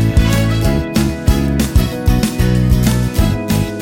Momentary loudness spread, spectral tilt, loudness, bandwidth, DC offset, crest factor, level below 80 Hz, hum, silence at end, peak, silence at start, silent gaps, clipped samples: 3 LU; -6 dB/octave; -15 LUFS; 17 kHz; under 0.1%; 12 dB; -18 dBFS; none; 0 s; 0 dBFS; 0 s; none; under 0.1%